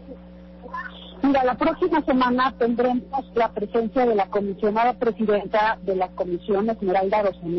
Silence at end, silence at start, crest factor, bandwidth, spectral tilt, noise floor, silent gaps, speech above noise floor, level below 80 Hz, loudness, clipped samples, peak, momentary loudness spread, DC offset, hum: 0 s; 0 s; 8 dB; 6 kHz; -8 dB/octave; -43 dBFS; none; 21 dB; -50 dBFS; -22 LUFS; under 0.1%; -14 dBFS; 14 LU; under 0.1%; 60 Hz at -45 dBFS